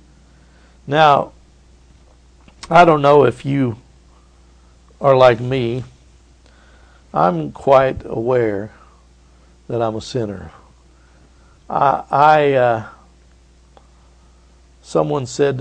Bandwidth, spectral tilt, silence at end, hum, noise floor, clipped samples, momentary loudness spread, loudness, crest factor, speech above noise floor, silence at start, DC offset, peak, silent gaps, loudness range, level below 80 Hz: 9.6 kHz; -6.5 dB/octave; 0 s; none; -49 dBFS; under 0.1%; 16 LU; -16 LUFS; 18 dB; 34 dB; 0.9 s; under 0.1%; 0 dBFS; none; 8 LU; -48 dBFS